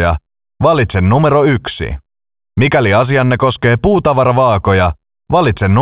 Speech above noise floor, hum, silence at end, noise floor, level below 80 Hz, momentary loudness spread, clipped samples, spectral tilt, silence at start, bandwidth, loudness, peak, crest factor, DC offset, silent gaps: over 79 dB; none; 0 s; under -90 dBFS; -28 dBFS; 12 LU; under 0.1%; -11 dB/octave; 0 s; 4 kHz; -12 LUFS; 0 dBFS; 12 dB; under 0.1%; none